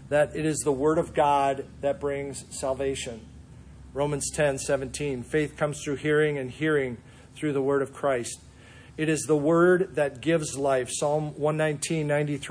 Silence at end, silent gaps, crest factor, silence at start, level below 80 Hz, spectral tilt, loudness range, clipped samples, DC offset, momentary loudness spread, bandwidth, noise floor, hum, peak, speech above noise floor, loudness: 0 s; none; 16 dB; 0 s; -52 dBFS; -5 dB/octave; 5 LU; under 0.1%; under 0.1%; 10 LU; 10.5 kHz; -49 dBFS; none; -10 dBFS; 23 dB; -26 LUFS